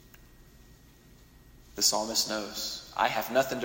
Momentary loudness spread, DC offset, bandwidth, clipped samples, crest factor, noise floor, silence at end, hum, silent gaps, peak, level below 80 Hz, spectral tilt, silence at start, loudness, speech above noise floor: 9 LU; under 0.1%; 16.5 kHz; under 0.1%; 22 dB; -56 dBFS; 0 s; none; none; -10 dBFS; -58 dBFS; -1 dB/octave; 0.4 s; -28 LUFS; 26 dB